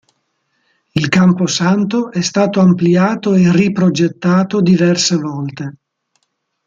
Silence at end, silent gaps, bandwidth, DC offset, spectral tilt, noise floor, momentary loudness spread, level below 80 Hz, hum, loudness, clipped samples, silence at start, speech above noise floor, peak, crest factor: 0.95 s; none; 7.6 kHz; under 0.1%; -5.5 dB/octave; -68 dBFS; 11 LU; -54 dBFS; none; -13 LUFS; under 0.1%; 0.95 s; 55 dB; -2 dBFS; 12 dB